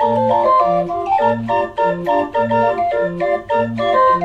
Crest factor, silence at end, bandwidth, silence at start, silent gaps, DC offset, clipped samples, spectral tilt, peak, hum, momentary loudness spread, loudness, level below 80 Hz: 12 dB; 0 s; 8.2 kHz; 0 s; none; under 0.1%; under 0.1%; -7.5 dB/octave; -2 dBFS; none; 5 LU; -16 LUFS; -48 dBFS